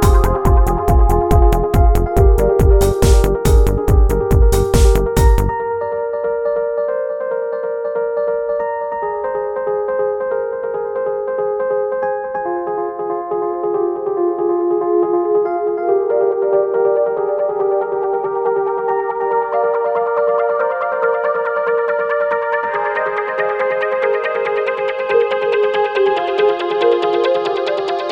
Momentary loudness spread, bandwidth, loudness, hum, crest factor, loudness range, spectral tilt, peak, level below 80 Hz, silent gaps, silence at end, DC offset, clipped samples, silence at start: 7 LU; 16.5 kHz; -17 LUFS; none; 14 dB; 6 LU; -6.5 dB/octave; 0 dBFS; -20 dBFS; none; 0 s; under 0.1%; under 0.1%; 0 s